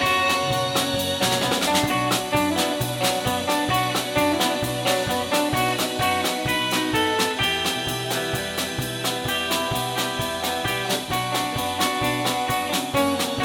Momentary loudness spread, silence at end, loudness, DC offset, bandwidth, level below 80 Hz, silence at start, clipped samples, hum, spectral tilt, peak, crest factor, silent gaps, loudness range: 4 LU; 0 s; -22 LUFS; under 0.1%; 17.5 kHz; -48 dBFS; 0 s; under 0.1%; none; -3 dB/octave; -8 dBFS; 16 dB; none; 2 LU